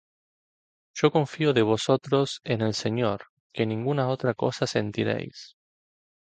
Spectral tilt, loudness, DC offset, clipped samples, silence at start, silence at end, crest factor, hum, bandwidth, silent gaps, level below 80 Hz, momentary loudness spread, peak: -6 dB/octave; -26 LUFS; under 0.1%; under 0.1%; 0.95 s; 0.85 s; 20 dB; none; 9.2 kHz; 3.29-3.50 s; -62 dBFS; 10 LU; -6 dBFS